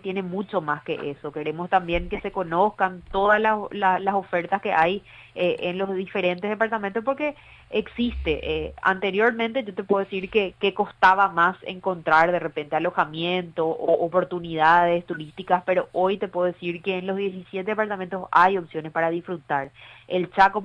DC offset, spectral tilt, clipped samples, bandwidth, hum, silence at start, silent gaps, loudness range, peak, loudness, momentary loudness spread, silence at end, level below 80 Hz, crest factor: under 0.1%; -7 dB/octave; under 0.1%; 9.8 kHz; none; 0.05 s; none; 4 LU; -4 dBFS; -24 LUFS; 10 LU; 0 s; -48 dBFS; 20 dB